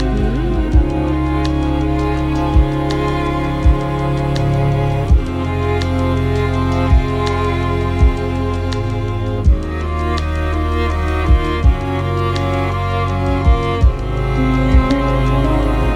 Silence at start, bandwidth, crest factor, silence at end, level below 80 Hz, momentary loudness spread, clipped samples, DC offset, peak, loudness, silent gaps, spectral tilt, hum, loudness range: 0 s; 10.5 kHz; 14 dB; 0 s; -18 dBFS; 4 LU; under 0.1%; under 0.1%; 0 dBFS; -17 LUFS; none; -7.5 dB/octave; none; 2 LU